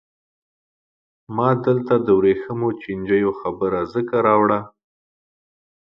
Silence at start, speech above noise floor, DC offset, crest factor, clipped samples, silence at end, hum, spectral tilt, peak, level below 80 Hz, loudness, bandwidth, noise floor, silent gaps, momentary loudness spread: 1.3 s; over 71 dB; under 0.1%; 18 dB; under 0.1%; 1.2 s; none; -10 dB/octave; -2 dBFS; -56 dBFS; -20 LUFS; 5.6 kHz; under -90 dBFS; none; 8 LU